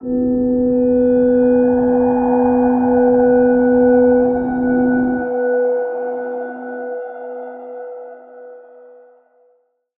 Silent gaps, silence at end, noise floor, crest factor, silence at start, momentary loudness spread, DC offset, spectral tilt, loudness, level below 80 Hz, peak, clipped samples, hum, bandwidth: none; 1.4 s; -60 dBFS; 12 dB; 0 s; 17 LU; under 0.1%; -12.5 dB/octave; -15 LUFS; -44 dBFS; -4 dBFS; under 0.1%; none; 2.6 kHz